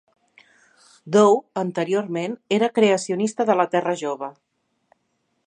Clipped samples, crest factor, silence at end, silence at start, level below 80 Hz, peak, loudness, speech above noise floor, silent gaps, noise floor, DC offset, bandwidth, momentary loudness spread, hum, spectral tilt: under 0.1%; 20 dB; 1.15 s; 1.05 s; -74 dBFS; -2 dBFS; -21 LUFS; 52 dB; none; -72 dBFS; under 0.1%; 10 kHz; 11 LU; none; -5 dB/octave